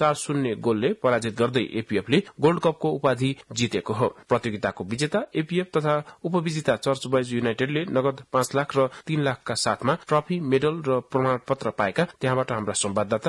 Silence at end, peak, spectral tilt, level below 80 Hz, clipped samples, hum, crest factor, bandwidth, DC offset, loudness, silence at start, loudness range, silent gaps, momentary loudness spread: 0 s; -8 dBFS; -5 dB/octave; -62 dBFS; under 0.1%; none; 16 dB; 12 kHz; under 0.1%; -25 LUFS; 0 s; 2 LU; none; 4 LU